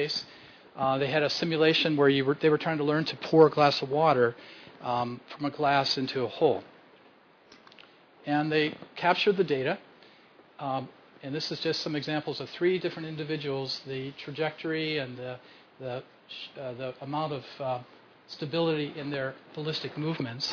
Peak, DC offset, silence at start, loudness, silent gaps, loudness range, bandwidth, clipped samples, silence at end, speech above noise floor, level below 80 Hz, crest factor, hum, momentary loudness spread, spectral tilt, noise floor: -8 dBFS; under 0.1%; 0 s; -28 LUFS; none; 11 LU; 5.4 kHz; under 0.1%; 0 s; 30 dB; -72 dBFS; 22 dB; none; 16 LU; -6 dB/octave; -58 dBFS